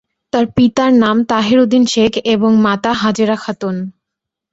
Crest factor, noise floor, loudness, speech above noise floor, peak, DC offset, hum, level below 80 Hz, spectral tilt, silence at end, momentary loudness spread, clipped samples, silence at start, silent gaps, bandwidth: 14 dB; -80 dBFS; -13 LUFS; 68 dB; 0 dBFS; under 0.1%; none; -48 dBFS; -5.5 dB/octave; 0.6 s; 10 LU; under 0.1%; 0.35 s; none; 8 kHz